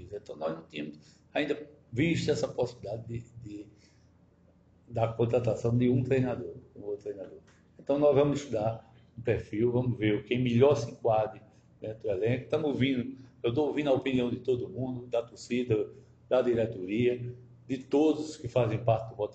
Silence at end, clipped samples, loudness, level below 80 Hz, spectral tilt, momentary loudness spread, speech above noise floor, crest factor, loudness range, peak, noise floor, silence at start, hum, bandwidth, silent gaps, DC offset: 0 s; under 0.1%; -30 LUFS; -60 dBFS; -7 dB/octave; 15 LU; 33 dB; 20 dB; 5 LU; -12 dBFS; -62 dBFS; 0 s; none; 8.2 kHz; none; under 0.1%